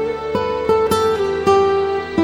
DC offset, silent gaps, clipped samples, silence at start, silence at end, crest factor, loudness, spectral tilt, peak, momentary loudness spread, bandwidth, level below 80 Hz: under 0.1%; none; under 0.1%; 0 s; 0 s; 14 dB; -17 LUFS; -5.5 dB/octave; -2 dBFS; 6 LU; 15 kHz; -42 dBFS